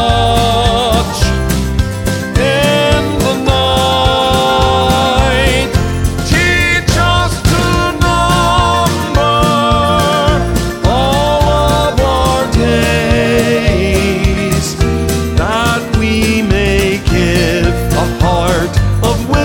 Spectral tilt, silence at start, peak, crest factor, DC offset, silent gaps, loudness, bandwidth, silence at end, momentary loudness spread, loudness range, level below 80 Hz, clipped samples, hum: -5 dB/octave; 0 s; 0 dBFS; 12 dB; under 0.1%; none; -12 LUFS; 17.5 kHz; 0 s; 4 LU; 2 LU; -20 dBFS; under 0.1%; none